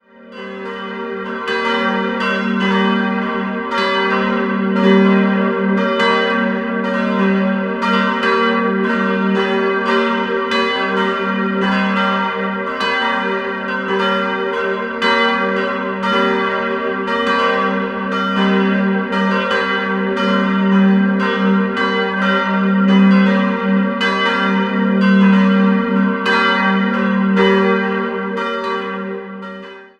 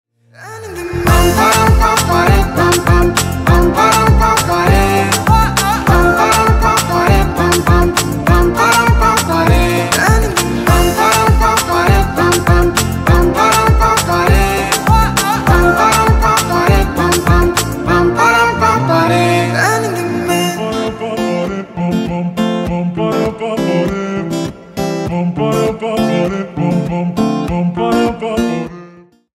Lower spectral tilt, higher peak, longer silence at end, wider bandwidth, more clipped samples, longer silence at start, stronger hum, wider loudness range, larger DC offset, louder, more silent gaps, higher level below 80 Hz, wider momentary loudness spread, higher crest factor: first, -7 dB/octave vs -5 dB/octave; about the same, 0 dBFS vs 0 dBFS; second, 0.15 s vs 0.5 s; second, 7.8 kHz vs 16.5 kHz; neither; second, 0.2 s vs 0.4 s; neither; second, 3 LU vs 6 LU; neither; second, -16 LUFS vs -12 LUFS; neither; second, -56 dBFS vs -20 dBFS; about the same, 8 LU vs 8 LU; about the same, 16 dB vs 12 dB